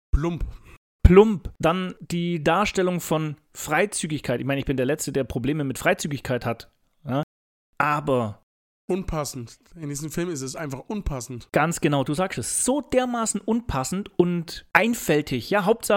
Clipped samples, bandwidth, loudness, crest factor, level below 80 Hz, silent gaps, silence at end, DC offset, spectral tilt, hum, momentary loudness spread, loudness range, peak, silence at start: under 0.1%; 17 kHz; -24 LUFS; 24 dB; -34 dBFS; 0.77-0.99 s, 7.23-7.73 s, 8.43-8.88 s; 0 s; under 0.1%; -5 dB/octave; none; 11 LU; 7 LU; 0 dBFS; 0.15 s